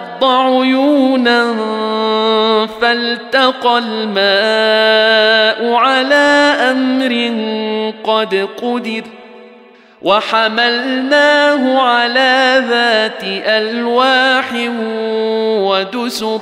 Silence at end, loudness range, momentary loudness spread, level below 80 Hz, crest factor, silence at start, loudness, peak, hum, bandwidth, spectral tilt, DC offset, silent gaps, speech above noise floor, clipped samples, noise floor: 0 s; 5 LU; 8 LU; -62 dBFS; 12 dB; 0 s; -12 LUFS; -2 dBFS; none; 15.5 kHz; -3.5 dB/octave; under 0.1%; none; 29 dB; under 0.1%; -42 dBFS